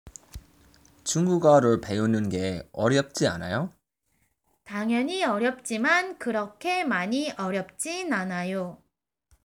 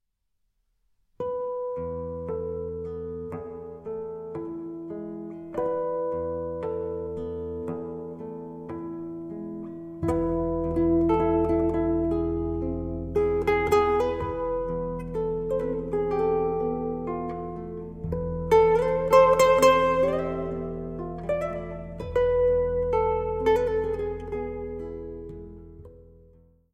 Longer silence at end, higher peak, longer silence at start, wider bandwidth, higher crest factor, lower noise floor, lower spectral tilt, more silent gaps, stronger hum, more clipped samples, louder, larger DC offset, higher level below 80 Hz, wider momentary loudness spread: about the same, 0.7 s vs 0.65 s; about the same, -6 dBFS vs -6 dBFS; second, 0.05 s vs 1.2 s; first, 19 kHz vs 15.5 kHz; about the same, 20 dB vs 20 dB; second, -72 dBFS vs -76 dBFS; second, -5 dB/octave vs -6.5 dB/octave; neither; neither; neither; about the same, -26 LUFS vs -26 LUFS; neither; second, -58 dBFS vs -42 dBFS; second, 10 LU vs 15 LU